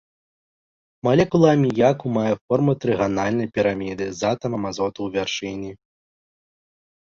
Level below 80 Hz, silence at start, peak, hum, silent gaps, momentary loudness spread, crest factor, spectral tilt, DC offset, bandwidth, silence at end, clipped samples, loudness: -54 dBFS; 1.05 s; -2 dBFS; none; 2.41-2.48 s; 10 LU; 20 dB; -6.5 dB/octave; under 0.1%; 7.6 kHz; 1.25 s; under 0.1%; -21 LUFS